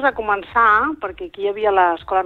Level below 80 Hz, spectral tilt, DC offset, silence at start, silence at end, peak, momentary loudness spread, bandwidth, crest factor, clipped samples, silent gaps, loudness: -48 dBFS; -6.5 dB/octave; under 0.1%; 0 s; 0 s; -2 dBFS; 11 LU; 6.6 kHz; 16 dB; under 0.1%; none; -17 LUFS